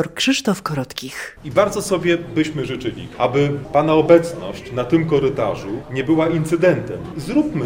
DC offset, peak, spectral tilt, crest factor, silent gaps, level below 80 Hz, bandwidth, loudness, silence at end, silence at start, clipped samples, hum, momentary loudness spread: under 0.1%; 0 dBFS; -5.5 dB/octave; 18 dB; none; -46 dBFS; 16.5 kHz; -19 LUFS; 0 s; 0 s; under 0.1%; none; 12 LU